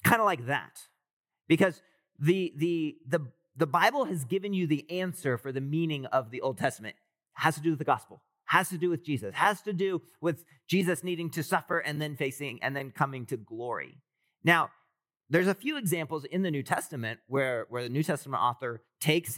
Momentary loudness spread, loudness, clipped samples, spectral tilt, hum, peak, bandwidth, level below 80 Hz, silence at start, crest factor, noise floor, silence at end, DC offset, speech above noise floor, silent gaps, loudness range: 10 LU; -30 LUFS; under 0.1%; -5.5 dB/octave; none; -6 dBFS; 17 kHz; -84 dBFS; 0.05 s; 24 dB; -76 dBFS; 0 s; under 0.1%; 47 dB; 1.13-1.24 s; 2 LU